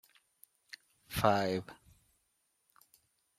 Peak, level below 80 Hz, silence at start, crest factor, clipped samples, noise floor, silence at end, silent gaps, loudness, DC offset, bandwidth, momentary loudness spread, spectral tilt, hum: -12 dBFS; -64 dBFS; 1.1 s; 28 dB; under 0.1%; -79 dBFS; 1.65 s; none; -33 LUFS; under 0.1%; 16 kHz; 24 LU; -5 dB/octave; none